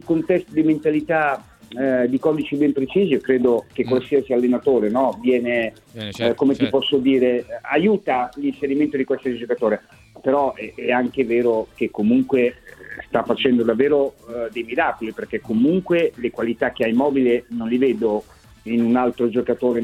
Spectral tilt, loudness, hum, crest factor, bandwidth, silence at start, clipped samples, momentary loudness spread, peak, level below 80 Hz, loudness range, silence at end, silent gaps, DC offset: -7 dB/octave; -20 LUFS; none; 16 dB; 12 kHz; 0.05 s; under 0.1%; 7 LU; -2 dBFS; -54 dBFS; 2 LU; 0 s; none; under 0.1%